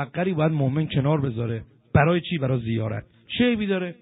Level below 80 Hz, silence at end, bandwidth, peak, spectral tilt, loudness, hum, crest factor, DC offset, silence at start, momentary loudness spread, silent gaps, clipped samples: -48 dBFS; 0.1 s; 4 kHz; -4 dBFS; -6 dB/octave; -24 LUFS; none; 20 dB; under 0.1%; 0 s; 10 LU; none; under 0.1%